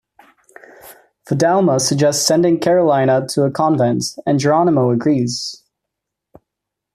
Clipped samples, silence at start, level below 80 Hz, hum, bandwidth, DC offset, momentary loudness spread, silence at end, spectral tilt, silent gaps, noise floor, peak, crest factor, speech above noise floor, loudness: under 0.1%; 0.85 s; -58 dBFS; none; 14.5 kHz; under 0.1%; 6 LU; 1.4 s; -5 dB/octave; none; -81 dBFS; -2 dBFS; 14 dB; 66 dB; -15 LUFS